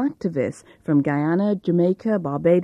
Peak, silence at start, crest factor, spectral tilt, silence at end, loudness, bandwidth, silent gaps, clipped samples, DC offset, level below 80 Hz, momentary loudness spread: -6 dBFS; 0 s; 14 dB; -9 dB/octave; 0 s; -22 LUFS; 10 kHz; none; under 0.1%; under 0.1%; -60 dBFS; 6 LU